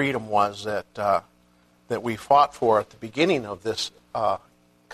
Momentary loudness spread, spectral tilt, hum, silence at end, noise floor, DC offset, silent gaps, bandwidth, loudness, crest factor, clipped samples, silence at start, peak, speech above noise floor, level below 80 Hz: 11 LU; -5 dB/octave; 60 Hz at -55 dBFS; 0 s; -60 dBFS; under 0.1%; none; 13.5 kHz; -24 LUFS; 20 dB; under 0.1%; 0 s; -6 dBFS; 36 dB; -62 dBFS